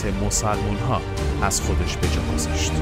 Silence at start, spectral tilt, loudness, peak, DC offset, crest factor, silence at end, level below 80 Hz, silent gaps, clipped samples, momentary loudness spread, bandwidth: 0 s; -4.5 dB/octave; -23 LUFS; -6 dBFS; under 0.1%; 16 dB; 0 s; -28 dBFS; none; under 0.1%; 3 LU; 16 kHz